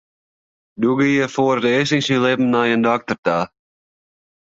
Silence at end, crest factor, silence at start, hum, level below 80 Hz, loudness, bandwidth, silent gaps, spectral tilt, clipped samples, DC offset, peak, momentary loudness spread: 1.05 s; 16 dB; 0.8 s; none; -60 dBFS; -18 LUFS; 7.8 kHz; 3.18-3.23 s; -5.5 dB/octave; under 0.1%; under 0.1%; -4 dBFS; 5 LU